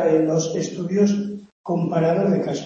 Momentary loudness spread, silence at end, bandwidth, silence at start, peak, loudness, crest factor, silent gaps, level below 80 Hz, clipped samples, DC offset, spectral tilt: 8 LU; 0 s; 7.6 kHz; 0 s; -6 dBFS; -21 LUFS; 14 dB; 1.52-1.64 s; -64 dBFS; under 0.1%; under 0.1%; -6.5 dB/octave